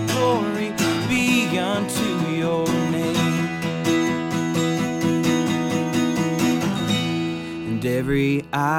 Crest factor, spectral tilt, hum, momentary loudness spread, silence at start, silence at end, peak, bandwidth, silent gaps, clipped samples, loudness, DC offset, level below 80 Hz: 14 dB; -5 dB/octave; none; 4 LU; 0 s; 0 s; -6 dBFS; 17.5 kHz; none; under 0.1%; -22 LUFS; under 0.1%; -50 dBFS